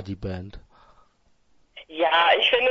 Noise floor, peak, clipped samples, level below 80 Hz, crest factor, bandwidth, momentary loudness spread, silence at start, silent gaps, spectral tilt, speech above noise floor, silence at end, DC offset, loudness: -63 dBFS; -4 dBFS; under 0.1%; -50 dBFS; 20 dB; 6.8 kHz; 21 LU; 0 s; none; -5 dB/octave; 41 dB; 0 s; under 0.1%; -21 LUFS